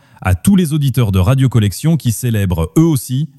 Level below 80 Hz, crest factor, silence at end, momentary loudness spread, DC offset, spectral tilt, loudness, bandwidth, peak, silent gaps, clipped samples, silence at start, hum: -34 dBFS; 12 dB; 0.15 s; 4 LU; under 0.1%; -6.5 dB/octave; -14 LUFS; 15 kHz; 0 dBFS; none; under 0.1%; 0.25 s; none